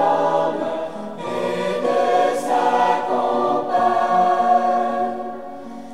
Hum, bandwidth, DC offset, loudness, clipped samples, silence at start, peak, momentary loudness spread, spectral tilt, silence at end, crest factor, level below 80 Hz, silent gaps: none; 13 kHz; 0.9%; -19 LUFS; under 0.1%; 0 s; -6 dBFS; 13 LU; -5 dB/octave; 0 s; 14 dB; -64 dBFS; none